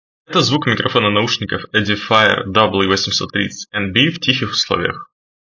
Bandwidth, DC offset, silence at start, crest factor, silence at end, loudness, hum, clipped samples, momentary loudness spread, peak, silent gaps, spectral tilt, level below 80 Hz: 7.6 kHz; under 0.1%; 0.3 s; 16 dB; 0.4 s; -15 LUFS; none; under 0.1%; 7 LU; 0 dBFS; none; -4 dB/octave; -44 dBFS